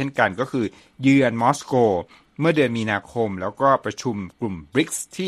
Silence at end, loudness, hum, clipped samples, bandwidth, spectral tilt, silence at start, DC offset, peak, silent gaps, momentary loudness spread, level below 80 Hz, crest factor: 0 s; -22 LUFS; none; under 0.1%; 13.5 kHz; -5.5 dB/octave; 0 s; under 0.1%; -2 dBFS; none; 11 LU; -58 dBFS; 20 dB